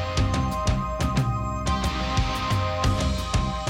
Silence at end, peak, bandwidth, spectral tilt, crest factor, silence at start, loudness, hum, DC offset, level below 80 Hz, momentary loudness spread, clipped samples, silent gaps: 0 s; -10 dBFS; 16.5 kHz; -5.5 dB/octave; 14 dB; 0 s; -25 LUFS; none; under 0.1%; -30 dBFS; 2 LU; under 0.1%; none